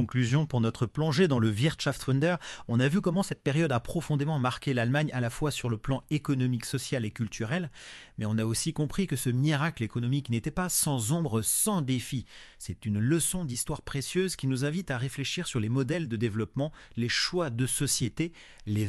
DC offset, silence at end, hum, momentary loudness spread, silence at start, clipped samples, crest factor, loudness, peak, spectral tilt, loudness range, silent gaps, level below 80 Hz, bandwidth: under 0.1%; 0 s; none; 8 LU; 0 s; under 0.1%; 16 dB; -29 LUFS; -12 dBFS; -5 dB/octave; 3 LU; none; -52 dBFS; 13.5 kHz